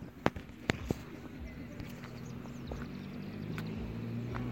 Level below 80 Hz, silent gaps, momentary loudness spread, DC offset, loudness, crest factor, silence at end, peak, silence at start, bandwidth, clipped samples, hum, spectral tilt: -52 dBFS; none; 9 LU; under 0.1%; -41 LUFS; 34 dB; 0 s; -6 dBFS; 0 s; 16.5 kHz; under 0.1%; none; -6.5 dB/octave